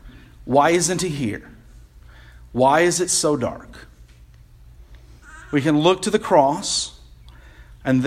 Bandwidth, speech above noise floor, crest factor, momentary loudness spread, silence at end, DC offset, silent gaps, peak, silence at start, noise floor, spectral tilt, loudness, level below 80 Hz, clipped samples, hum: 15.5 kHz; 28 dB; 20 dB; 14 LU; 0 s; under 0.1%; none; -2 dBFS; 0.05 s; -47 dBFS; -4 dB/octave; -19 LUFS; -46 dBFS; under 0.1%; none